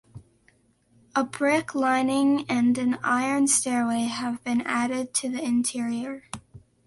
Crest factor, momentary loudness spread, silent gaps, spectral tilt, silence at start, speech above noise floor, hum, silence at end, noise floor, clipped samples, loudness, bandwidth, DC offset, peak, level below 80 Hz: 16 dB; 8 LU; none; -3 dB/octave; 0.15 s; 39 dB; none; 0.3 s; -63 dBFS; under 0.1%; -25 LUFS; 11.5 kHz; under 0.1%; -10 dBFS; -64 dBFS